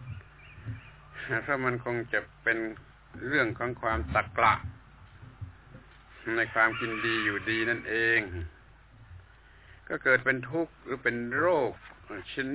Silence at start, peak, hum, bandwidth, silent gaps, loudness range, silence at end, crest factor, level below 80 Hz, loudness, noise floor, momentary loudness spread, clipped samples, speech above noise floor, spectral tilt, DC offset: 0 s; -10 dBFS; none; 4 kHz; none; 3 LU; 0 s; 22 dB; -50 dBFS; -29 LUFS; -55 dBFS; 20 LU; under 0.1%; 26 dB; -3.5 dB/octave; under 0.1%